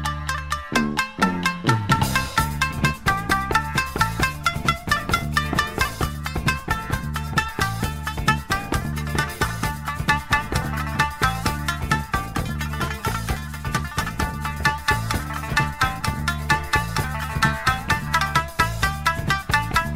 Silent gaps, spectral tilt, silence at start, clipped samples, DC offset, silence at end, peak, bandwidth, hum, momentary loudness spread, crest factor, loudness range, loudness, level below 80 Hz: none; -4 dB/octave; 0 s; under 0.1%; under 0.1%; 0 s; -2 dBFS; 16 kHz; none; 6 LU; 20 dB; 3 LU; -23 LUFS; -34 dBFS